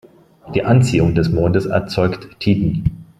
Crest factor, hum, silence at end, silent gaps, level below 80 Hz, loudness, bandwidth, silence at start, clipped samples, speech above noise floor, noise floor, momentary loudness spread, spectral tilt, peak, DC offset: 16 dB; none; 0.15 s; none; -36 dBFS; -17 LUFS; 12 kHz; 0.45 s; under 0.1%; 22 dB; -38 dBFS; 8 LU; -7.5 dB/octave; 0 dBFS; under 0.1%